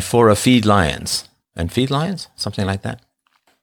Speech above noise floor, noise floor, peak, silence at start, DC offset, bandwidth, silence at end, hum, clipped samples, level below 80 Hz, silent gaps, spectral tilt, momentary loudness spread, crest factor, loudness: 45 dB; -62 dBFS; -2 dBFS; 0 s; under 0.1%; over 20 kHz; 0.65 s; none; under 0.1%; -40 dBFS; none; -5 dB/octave; 14 LU; 16 dB; -18 LUFS